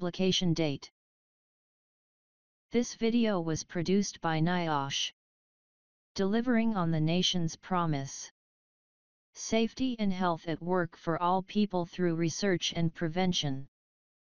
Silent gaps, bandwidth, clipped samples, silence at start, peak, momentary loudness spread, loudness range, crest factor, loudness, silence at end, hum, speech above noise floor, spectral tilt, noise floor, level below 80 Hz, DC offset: 0.92-2.69 s, 5.13-6.15 s, 8.31-9.33 s; 7.2 kHz; under 0.1%; 0 s; -14 dBFS; 7 LU; 3 LU; 16 dB; -31 LUFS; 0.65 s; none; over 60 dB; -5 dB/octave; under -90 dBFS; -60 dBFS; 0.6%